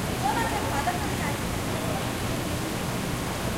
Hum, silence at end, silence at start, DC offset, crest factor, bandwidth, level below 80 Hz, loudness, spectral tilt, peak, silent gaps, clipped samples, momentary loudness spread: none; 0 s; 0 s; under 0.1%; 14 dB; 16 kHz; -40 dBFS; -28 LUFS; -4.5 dB/octave; -14 dBFS; none; under 0.1%; 3 LU